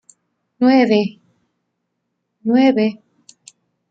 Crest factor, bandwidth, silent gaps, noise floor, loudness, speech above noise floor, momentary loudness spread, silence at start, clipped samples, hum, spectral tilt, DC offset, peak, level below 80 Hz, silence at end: 18 dB; 8 kHz; none; -74 dBFS; -16 LUFS; 60 dB; 11 LU; 0.6 s; under 0.1%; none; -6.5 dB/octave; under 0.1%; -2 dBFS; -66 dBFS; 0.95 s